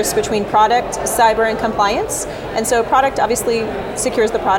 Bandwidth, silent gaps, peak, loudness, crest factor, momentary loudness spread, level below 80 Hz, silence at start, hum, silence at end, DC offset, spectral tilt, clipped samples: 19 kHz; none; -2 dBFS; -16 LUFS; 14 dB; 7 LU; -38 dBFS; 0 s; none; 0 s; under 0.1%; -3 dB/octave; under 0.1%